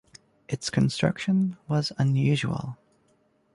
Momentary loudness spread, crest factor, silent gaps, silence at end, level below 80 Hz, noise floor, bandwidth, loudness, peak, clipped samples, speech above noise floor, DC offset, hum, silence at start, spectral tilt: 11 LU; 18 dB; none; 0.8 s; -56 dBFS; -66 dBFS; 11.5 kHz; -26 LUFS; -8 dBFS; under 0.1%; 41 dB; under 0.1%; none; 0.5 s; -6 dB/octave